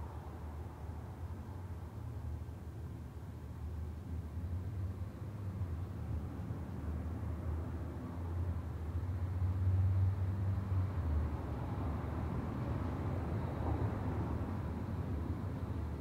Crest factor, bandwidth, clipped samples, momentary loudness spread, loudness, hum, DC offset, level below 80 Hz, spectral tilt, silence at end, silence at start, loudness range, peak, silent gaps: 14 dB; 7.2 kHz; under 0.1%; 10 LU; -40 LUFS; none; under 0.1%; -48 dBFS; -9 dB/octave; 0 s; 0 s; 9 LU; -24 dBFS; none